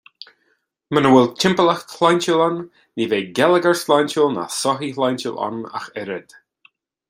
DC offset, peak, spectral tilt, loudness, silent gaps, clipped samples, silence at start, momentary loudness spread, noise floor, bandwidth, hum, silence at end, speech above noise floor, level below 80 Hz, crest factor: under 0.1%; -2 dBFS; -4.5 dB/octave; -18 LUFS; none; under 0.1%; 0.9 s; 15 LU; -66 dBFS; 16 kHz; none; 0.9 s; 48 dB; -62 dBFS; 18 dB